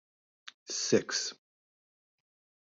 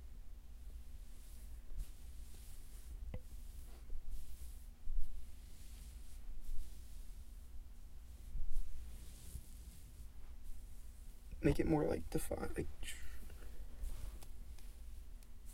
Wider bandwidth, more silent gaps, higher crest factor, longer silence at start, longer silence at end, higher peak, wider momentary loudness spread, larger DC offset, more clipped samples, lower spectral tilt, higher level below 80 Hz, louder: second, 8 kHz vs 16 kHz; first, 0.54-0.66 s vs none; first, 26 dB vs 20 dB; first, 0.45 s vs 0 s; first, 1.4 s vs 0 s; first, -12 dBFS vs -20 dBFS; first, 23 LU vs 17 LU; neither; neither; second, -2.5 dB/octave vs -6 dB/octave; second, -76 dBFS vs -46 dBFS; first, -31 LUFS vs -48 LUFS